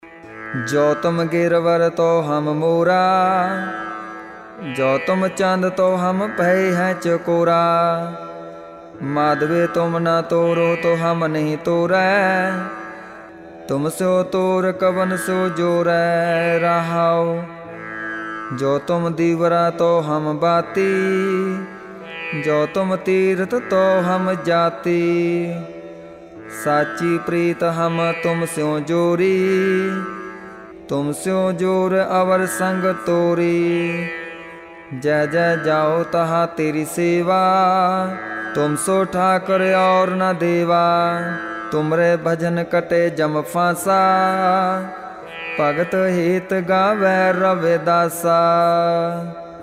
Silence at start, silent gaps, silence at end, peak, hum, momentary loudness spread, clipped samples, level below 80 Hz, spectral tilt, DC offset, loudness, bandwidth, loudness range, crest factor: 0.05 s; none; 0 s; -4 dBFS; none; 14 LU; under 0.1%; -60 dBFS; -6 dB/octave; under 0.1%; -18 LUFS; 15.5 kHz; 3 LU; 14 dB